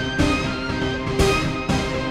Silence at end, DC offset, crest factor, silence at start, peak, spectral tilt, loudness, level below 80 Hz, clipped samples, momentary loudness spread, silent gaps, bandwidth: 0 s; under 0.1%; 16 dB; 0 s; -6 dBFS; -5 dB/octave; -22 LUFS; -32 dBFS; under 0.1%; 5 LU; none; 15.5 kHz